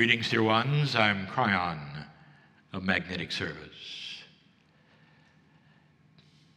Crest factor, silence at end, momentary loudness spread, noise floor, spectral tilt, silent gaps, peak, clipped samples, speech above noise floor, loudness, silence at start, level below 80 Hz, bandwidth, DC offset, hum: 26 dB; 2.3 s; 18 LU; -63 dBFS; -5.5 dB/octave; none; -6 dBFS; under 0.1%; 35 dB; -28 LUFS; 0 s; -66 dBFS; 11 kHz; under 0.1%; none